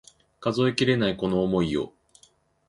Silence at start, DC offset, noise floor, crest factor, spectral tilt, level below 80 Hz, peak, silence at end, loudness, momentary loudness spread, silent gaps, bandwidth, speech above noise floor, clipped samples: 0.4 s; under 0.1%; -61 dBFS; 18 dB; -6.5 dB/octave; -52 dBFS; -8 dBFS; 0.8 s; -25 LUFS; 8 LU; none; 11.5 kHz; 37 dB; under 0.1%